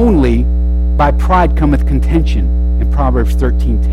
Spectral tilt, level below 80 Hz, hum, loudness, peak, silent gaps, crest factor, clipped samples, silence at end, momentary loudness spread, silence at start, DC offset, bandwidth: -8.5 dB/octave; -12 dBFS; none; -13 LUFS; -2 dBFS; none; 10 dB; under 0.1%; 0 s; 4 LU; 0 s; under 0.1%; 6 kHz